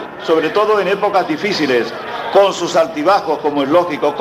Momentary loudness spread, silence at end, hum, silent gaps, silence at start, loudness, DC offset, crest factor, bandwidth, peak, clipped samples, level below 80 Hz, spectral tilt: 5 LU; 0 s; none; none; 0 s; -15 LUFS; under 0.1%; 14 dB; 15 kHz; 0 dBFS; under 0.1%; -58 dBFS; -4.5 dB/octave